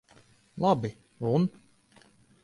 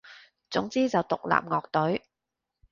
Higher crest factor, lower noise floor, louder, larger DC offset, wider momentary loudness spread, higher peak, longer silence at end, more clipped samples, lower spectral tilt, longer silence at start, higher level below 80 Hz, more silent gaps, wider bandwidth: about the same, 20 dB vs 24 dB; second, -60 dBFS vs -87 dBFS; about the same, -29 LUFS vs -28 LUFS; neither; first, 11 LU vs 6 LU; second, -12 dBFS vs -6 dBFS; first, 0.95 s vs 0.75 s; neither; first, -8.5 dB/octave vs -6 dB/octave; first, 0.55 s vs 0.05 s; about the same, -64 dBFS vs -64 dBFS; neither; first, 11 kHz vs 7.4 kHz